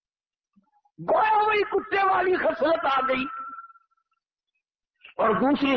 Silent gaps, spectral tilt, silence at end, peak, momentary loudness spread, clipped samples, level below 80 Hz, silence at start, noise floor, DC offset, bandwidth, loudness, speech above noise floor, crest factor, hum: none; -7 dB/octave; 0 s; -12 dBFS; 15 LU; under 0.1%; -60 dBFS; 1 s; under -90 dBFS; under 0.1%; 6 kHz; -23 LUFS; over 67 dB; 12 dB; none